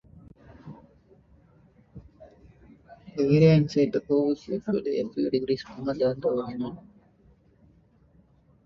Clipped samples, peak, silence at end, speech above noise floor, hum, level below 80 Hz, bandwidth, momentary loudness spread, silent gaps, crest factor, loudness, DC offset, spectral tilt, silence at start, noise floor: under 0.1%; -6 dBFS; 1.85 s; 36 dB; none; -58 dBFS; 6.8 kHz; 25 LU; none; 22 dB; -25 LUFS; under 0.1%; -8.5 dB/octave; 0.15 s; -60 dBFS